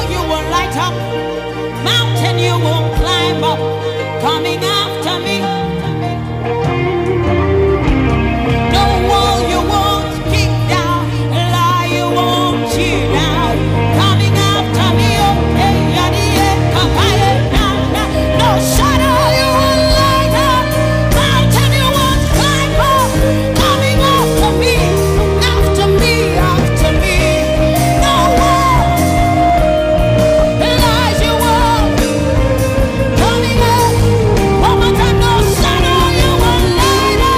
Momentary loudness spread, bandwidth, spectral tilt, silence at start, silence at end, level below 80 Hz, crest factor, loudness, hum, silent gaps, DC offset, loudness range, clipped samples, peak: 5 LU; 16 kHz; -5 dB/octave; 0 s; 0 s; -20 dBFS; 8 dB; -12 LUFS; none; none; under 0.1%; 4 LU; under 0.1%; -4 dBFS